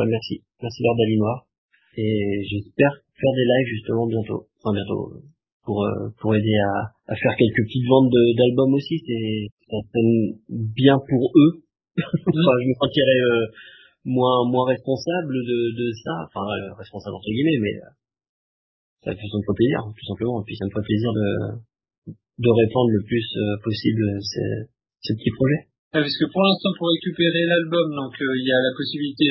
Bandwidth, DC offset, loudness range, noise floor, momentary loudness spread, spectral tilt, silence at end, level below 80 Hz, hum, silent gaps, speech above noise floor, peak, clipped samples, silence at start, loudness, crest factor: 6 kHz; under 0.1%; 6 LU; under -90 dBFS; 13 LU; -8 dB/octave; 0 s; -52 dBFS; none; 1.58-1.69 s, 5.52-5.60 s, 9.52-9.57 s, 18.29-18.97 s, 21.98-22.02 s, 25.79-25.91 s; over 69 dB; 0 dBFS; under 0.1%; 0 s; -21 LUFS; 20 dB